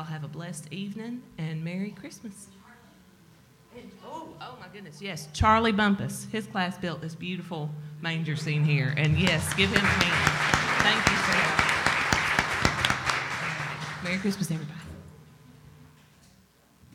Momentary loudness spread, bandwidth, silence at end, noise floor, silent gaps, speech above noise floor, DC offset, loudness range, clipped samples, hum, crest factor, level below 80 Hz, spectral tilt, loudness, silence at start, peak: 20 LU; 17 kHz; 1.1 s; -60 dBFS; none; 32 dB; under 0.1%; 16 LU; under 0.1%; none; 26 dB; -48 dBFS; -4 dB/octave; -26 LUFS; 0 s; -2 dBFS